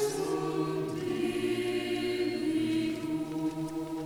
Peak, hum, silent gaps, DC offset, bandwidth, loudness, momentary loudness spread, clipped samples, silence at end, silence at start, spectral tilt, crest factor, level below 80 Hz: -18 dBFS; none; none; under 0.1%; 18 kHz; -32 LUFS; 4 LU; under 0.1%; 0 s; 0 s; -5.5 dB/octave; 12 dB; -62 dBFS